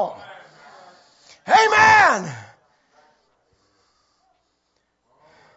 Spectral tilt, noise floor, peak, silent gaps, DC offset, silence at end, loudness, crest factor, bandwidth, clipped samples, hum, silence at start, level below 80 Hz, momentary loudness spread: -2.5 dB/octave; -70 dBFS; -2 dBFS; none; under 0.1%; 3.15 s; -15 LUFS; 20 dB; 8 kHz; under 0.1%; none; 0 s; -60 dBFS; 27 LU